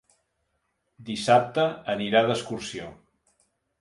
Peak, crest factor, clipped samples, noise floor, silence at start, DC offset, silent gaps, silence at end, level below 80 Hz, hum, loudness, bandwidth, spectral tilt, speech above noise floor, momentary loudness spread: -6 dBFS; 22 dB; under 0.1%; -76 dBFS; 1 s; under 0.1%; none; 0.85 s; -64 dBFS; none; -25 LUFS; 11.5 kHz; -4.5 dB/octave; 51 dB; 17 LU